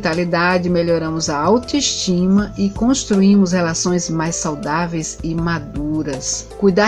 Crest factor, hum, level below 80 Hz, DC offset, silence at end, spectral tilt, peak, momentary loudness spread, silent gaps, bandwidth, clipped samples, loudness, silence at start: 16 dB; none; -38 dBFS; under 0.1%; 0 s; -4.5 dB/octave; 0 dBFS; 8 LU; none; 10.5 kHz; under 0.1%; -17 LUFS; 0 s